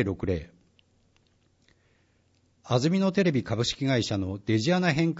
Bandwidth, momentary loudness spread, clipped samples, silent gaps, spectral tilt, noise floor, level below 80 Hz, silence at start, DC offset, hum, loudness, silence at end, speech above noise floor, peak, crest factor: 8 kHz; 7 LU; under 0.1%; none; -6 dB/octave; -67 dBFS; -54 dBFS; 0 s; under 0.1%; none; -26 LUFS; 0 s; 41 dB; -10 dBFS; 18 dB